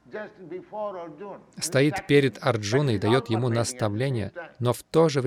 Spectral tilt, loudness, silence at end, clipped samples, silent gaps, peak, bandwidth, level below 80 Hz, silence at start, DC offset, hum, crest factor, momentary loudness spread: -5.5 dB/octave; -25 LUFS; 0 s; under 0.1%; none; -8 dBFS; 15.5 kHz; -62 dBFS; 0.1 s; under 0.1%; none; 18 dB; 17 LU